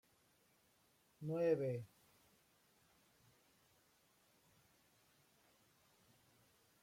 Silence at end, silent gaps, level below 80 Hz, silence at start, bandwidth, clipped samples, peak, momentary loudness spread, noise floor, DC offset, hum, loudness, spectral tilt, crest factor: 4.95 s; none; -86 dBFS; 1.2 s; 16.5 kHz; under 0.1%; -26 dBFS; 15 LU; -76 dBFS; under 0.1%; none; -41 LUFS; -8 dB/octave; 24 dB